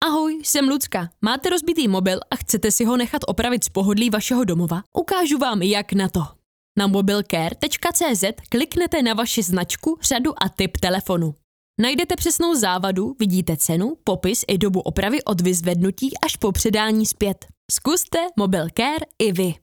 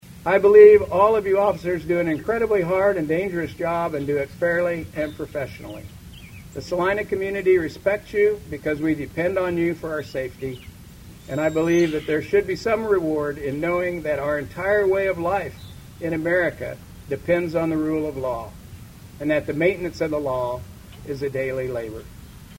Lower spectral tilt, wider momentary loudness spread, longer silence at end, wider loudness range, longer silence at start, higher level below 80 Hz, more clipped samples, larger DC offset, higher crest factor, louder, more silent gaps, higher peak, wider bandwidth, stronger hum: second, -4 dB/octave vs -6.5 dB/octave; second, 5 LU vs 15 LU; about the same, 0.1 s vs 0 s; second, 1 LU vs 5 LU; about the same, 0 s vs 0.05 s; first, -42 dBFS vs -48 dBFS; neither; neither; about the same, 20 dB vs 20 dB; about the same, -20 LUFS vs -22 LUFS; first, 4.86-4.92 s, 6.46-6.75 s, 11.44-11.74 s, 17.57-17.69 s vs none; about the same, 0 dBFS vs -2 dBFS; first, over 20 kHz vs 16.5 kHz; neither